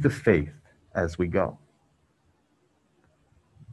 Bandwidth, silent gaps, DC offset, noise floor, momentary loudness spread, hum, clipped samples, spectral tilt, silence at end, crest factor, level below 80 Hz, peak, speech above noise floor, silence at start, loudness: 12 kHz; none; under 0.1%; -68 dBFS; 10 LU; none; under 0.1%; -8 dB/octave; 0 s; 22 dB; -46 dBFS; -6 dBFS; 43 dB; 0 s; -27 LUFS